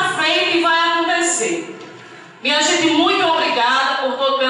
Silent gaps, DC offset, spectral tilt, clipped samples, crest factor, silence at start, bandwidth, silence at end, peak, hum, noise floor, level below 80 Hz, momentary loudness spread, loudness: none; under 0.1%; -1 dB/octave; under 0.1%; 12 dB; 0 s; 11.5 kHz; 0 s; -4 dBFS; none; -39 dBFS; -76 dBFS; 9 LU; -16 LUFS